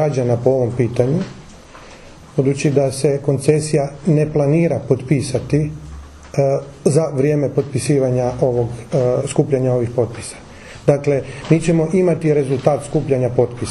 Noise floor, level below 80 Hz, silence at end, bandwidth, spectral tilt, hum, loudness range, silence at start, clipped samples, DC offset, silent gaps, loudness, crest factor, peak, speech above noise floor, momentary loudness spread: -39 dBFS; -42 dBFS; 0 s; 12 kHz; -7 dB/octave; none; 2 LU; 0 s; under 0.1%; under 0.1%; none; -17 LUFS; 16 dB; 0 dBFS; 23 dB; 6 LU